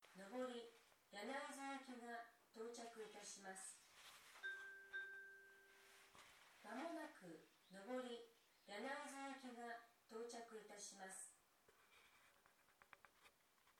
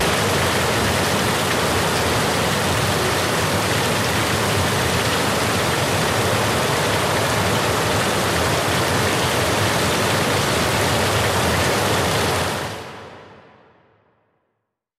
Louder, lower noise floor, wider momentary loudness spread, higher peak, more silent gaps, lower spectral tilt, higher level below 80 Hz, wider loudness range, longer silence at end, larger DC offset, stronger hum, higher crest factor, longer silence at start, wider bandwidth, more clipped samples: second, -55 LUFS vs -18 LUFS; about the same, -78 dBFS vs -76 dBFS; first, 14 LU vs 1 LU; second, -38 dBFS vs -8 dBFS; neither; second, -2 dB/octave vs -3.5 dB/octave; second, under -90 dBFS vs -40 dBFS; about the same, 4 LU vs 2 LU; second, 0.05 s vs 1.6 s; neither; neither; first, 20 dB vs 12 dB; about the same, 0 s vs 0 s; first, 19 kHz vs 16 kHz; neither